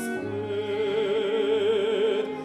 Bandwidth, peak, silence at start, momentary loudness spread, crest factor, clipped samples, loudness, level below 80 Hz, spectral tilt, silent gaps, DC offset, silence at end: 13.5 kHz; -14 dBFS; 0 s; 7 LU; 12 dB; under 0.1%; -26 LUFS; -68 dBFS; -5 dB/octave; none; under 0.1%; 0 s